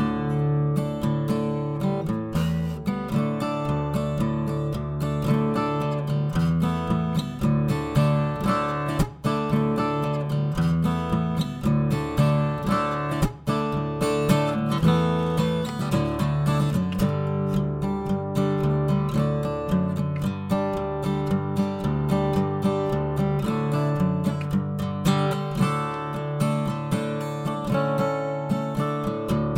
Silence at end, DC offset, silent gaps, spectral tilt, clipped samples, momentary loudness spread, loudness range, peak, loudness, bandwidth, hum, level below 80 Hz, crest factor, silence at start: 0 s; under 0.1%; none; -7.5 dB/octave; under 0.1%; 4 LU; 2 LU; -6 dBFS; -25 LUFS; 16 kHz; none; -42 dBFS; 18 dB; 0 s